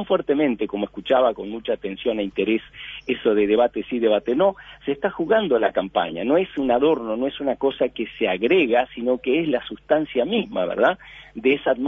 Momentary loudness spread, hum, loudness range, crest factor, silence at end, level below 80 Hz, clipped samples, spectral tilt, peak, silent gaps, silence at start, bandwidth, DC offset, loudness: 8 LU; none; 1 LU; 16 dB; 0 s; -54 dBFS; under 0.1%; -8 dB/octave; -4 dBFS; none; 0 s; 5.8 kHz; under 0.1%; -22 LUFS